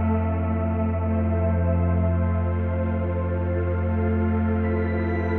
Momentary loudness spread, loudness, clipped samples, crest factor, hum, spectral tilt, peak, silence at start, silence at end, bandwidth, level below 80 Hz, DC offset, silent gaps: 3 LU; -24 LUFS; under 0.1%; 10 dB; none; -12 dB/octave; -12 dBFS; 0 s; 0 s; 4.1 kHz; -40 dBFS; under 0.1%; none